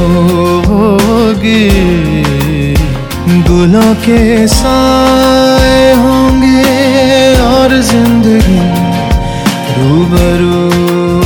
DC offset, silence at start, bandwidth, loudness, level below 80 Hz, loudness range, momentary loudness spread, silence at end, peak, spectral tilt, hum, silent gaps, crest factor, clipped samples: under 0.1%; 0 s; over 20 kHz; -8 LUFS; -18 dBFS; 2 LU; 5 LU; 0 s; 0 dBFS; -6 dB/octave; none; none; 6 dB; 1%